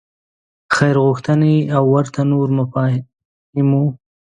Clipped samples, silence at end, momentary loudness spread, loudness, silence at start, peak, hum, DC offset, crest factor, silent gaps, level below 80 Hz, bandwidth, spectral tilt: under 0.1%; 0.4 s; 6 LU; -16 LUFS; 0.7 s; 0 dBFS; none; under 0.1%; 16 dB; 3.25-3.53 s; -56 dBFS; 10 kHz; -7.5 dB/octave